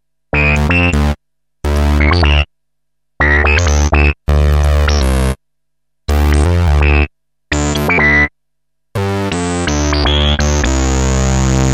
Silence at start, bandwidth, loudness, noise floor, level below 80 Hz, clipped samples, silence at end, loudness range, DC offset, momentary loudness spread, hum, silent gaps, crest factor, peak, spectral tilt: 0.35 s; 13.5 kHz; -13 LUFS; -77 dBFS; -16 dBFS; under 0.1%; 0 s; 2 LU; under 0.1%; 8 LU; none; none; 12 dB; 0 dBFS; -5 dB/octave